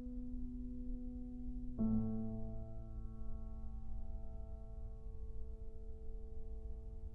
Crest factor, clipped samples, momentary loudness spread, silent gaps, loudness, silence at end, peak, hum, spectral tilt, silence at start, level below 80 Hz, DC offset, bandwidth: 16 dB; under 0.1%; 13 LU; none; -48 LUFS; 0 s; -26 dBFS; none; -11.5 dB/octave; 0 s; -46 dBFS; under 0.1%; 1.4 kHz